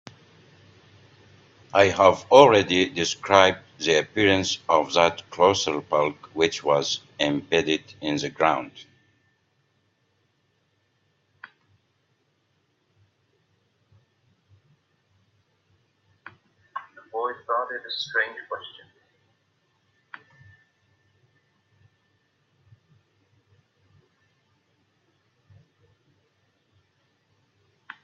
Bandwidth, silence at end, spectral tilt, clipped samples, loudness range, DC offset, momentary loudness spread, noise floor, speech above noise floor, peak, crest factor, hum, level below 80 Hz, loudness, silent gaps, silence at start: 7.8 kHz; 9.35 s; -3.5 dB/octave; under 0.1%; 15 LU; under 0.1%; 23 LU; -70 dBFS; 49 dB; 0 dBFS; 26 dB; none; -66 dBFS; -22 LUFS; none; 1.75 s